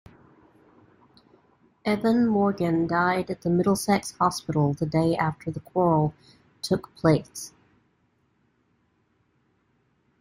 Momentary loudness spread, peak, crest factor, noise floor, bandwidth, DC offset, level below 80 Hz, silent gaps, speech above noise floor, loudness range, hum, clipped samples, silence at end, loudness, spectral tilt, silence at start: 9 LU; -8 dBFS; 20 dB; -69 dBFS; 16 kHz; under 0.1%; -58 dBFS; none; 45 dB; 7 LU; none; under 0.1%; 2.75 s; -25 LUFS; -6.5 dB/octave; 1.85 s